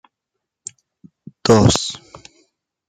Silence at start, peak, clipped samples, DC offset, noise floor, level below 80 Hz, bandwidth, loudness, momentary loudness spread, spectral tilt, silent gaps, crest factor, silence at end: 1.45 s; -2 dBFS; under 0.1%; under 0.1%; -81 dBFS; -42 dBFS; 13.5 kHz; -16 LUFS; 23 LU; -5 dB/octave; none; 20 dB; 0.9 s